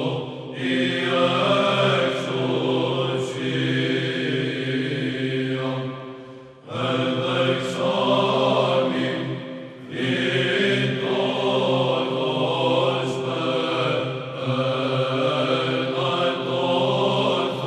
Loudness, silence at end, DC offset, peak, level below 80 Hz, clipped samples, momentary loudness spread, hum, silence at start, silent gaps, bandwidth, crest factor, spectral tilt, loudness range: -22 LUFS; 0 s; under 0.1%; -6 dBFS; -66 dBFS; under 0.1%; 9 LU; none; 0 s; none; 10 kHz; 16 dB; -6 dB/octave; 3 LU